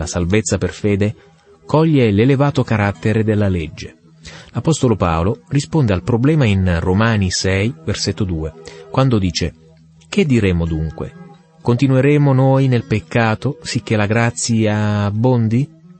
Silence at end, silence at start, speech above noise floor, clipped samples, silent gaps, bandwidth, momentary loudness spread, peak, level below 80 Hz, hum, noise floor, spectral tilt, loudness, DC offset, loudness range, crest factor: 0.35 s; 0 s; 30 dB; under 0.1%; none; 8.8 kHz; 10 LU; -2 dBFS; -38 dBFS; none; -46 dBFS; -6 dB/octave; -16 LUFS; under 0.1%; 3 LU; 14 dB